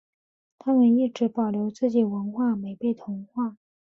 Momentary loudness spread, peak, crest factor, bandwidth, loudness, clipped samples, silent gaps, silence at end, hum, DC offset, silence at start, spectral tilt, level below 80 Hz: 12 LU; -10 dBFS; 14 dB; 6.8 kHz; -25 LUFS; under 0.1%; none; 0.35 s; none; under 0.1%; 0.65 s; -8.5 dB/octave; -70 dBFS